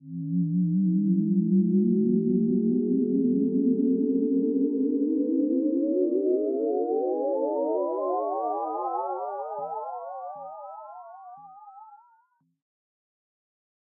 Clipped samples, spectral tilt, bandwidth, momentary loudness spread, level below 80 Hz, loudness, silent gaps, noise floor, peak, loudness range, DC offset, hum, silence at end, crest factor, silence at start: under 0.1%; -16 dB/octave; 1.6 kHz; 14 LU; -82 dBFS; -26 LUFS; none; -66 dBFS; -12 dBFS; 15 LU; under 0.1%; none; 2 s; 14 dB; 0.05 s